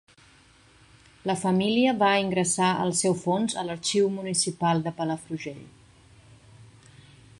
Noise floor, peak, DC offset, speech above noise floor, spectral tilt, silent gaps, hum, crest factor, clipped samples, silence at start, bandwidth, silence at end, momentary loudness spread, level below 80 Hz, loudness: -56 dBFS; -8 dBFS; under 0.1%; 31 dB; -4 dB/octave; none; none; 18 dB; under 0.1%; 1.25 s; 11.5 kHz; 0.75 s; 12 LU; -64 dBFS; -25 LUFS